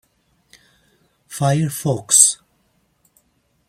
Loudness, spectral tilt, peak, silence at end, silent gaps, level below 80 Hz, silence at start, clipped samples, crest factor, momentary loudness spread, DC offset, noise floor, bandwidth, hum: -15 LUFS; -3.5 dB/octave; 0 dBFS; 1.35 s; none; -60 dBFS; 1.3 s; under 0.1%; 22 dB; 18 LU; under 0.1%; -64 dBFS; 16.5 kHz; none